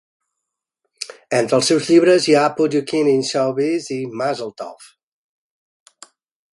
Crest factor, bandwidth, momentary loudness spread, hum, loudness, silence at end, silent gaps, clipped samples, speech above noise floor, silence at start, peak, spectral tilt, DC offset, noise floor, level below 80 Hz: 18 dB; 11.5 kHz; 19 LU; none; -17 LUFS; 1.7 s; none; under 0.1%; 64 dB; 1 s; -2 dBFS; -4.5 dB/octave; under 0.1%; -81 dBFS; -66 dBFS